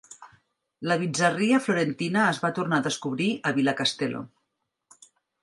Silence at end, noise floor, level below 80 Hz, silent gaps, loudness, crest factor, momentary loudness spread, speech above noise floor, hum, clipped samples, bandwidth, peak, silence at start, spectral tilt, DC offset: 1.15 s; -79 dBFS; -72 dBFS; none; -25 LUFS; 22 dB; 8 LU; 55 dB; none; under 0.1%; 11.5 kHz; -6 dBFS; 0.1 s; -4.5 dB/octave; under 0.1%